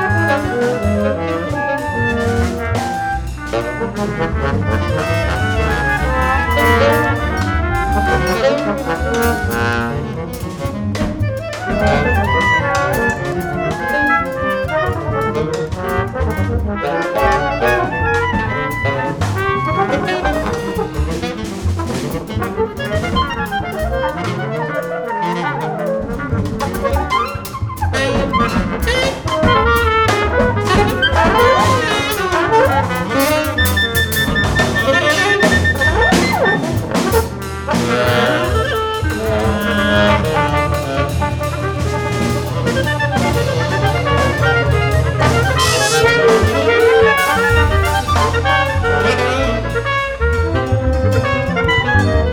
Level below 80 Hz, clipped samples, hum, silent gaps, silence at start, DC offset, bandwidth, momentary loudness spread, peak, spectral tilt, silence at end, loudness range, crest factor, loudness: -26 dBFS; under 0.1%; none; none; 0 s; 0.1%; over 20 kHz; 8 LU; 0 dBFS; -5 dB/octave; 0 s; 6 LU; 14 dB; -16 LUFS